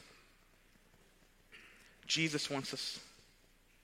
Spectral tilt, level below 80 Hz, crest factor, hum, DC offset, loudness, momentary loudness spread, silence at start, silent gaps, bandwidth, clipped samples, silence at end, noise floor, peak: -3 dB/octave; -72 dBFS; 22 dB; none; under 0.1%; -37 LUFS; 26 LU; 0 s; none; 16 kHz; under 0.1%; 0.7 s; -67 dBFS; -20 dBFS